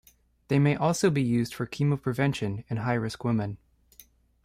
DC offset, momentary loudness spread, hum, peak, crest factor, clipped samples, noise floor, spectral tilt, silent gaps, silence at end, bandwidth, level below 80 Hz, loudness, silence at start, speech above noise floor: under 0.1%; 8 LU; none; -10 dBFS; 18 dB; under 0.1%; -57 dBFS; -6.5 dB/octave; none; 0.9 s; 15 kHz; -58 dBFS; -27 LUFS; 0.5 s; 31 dB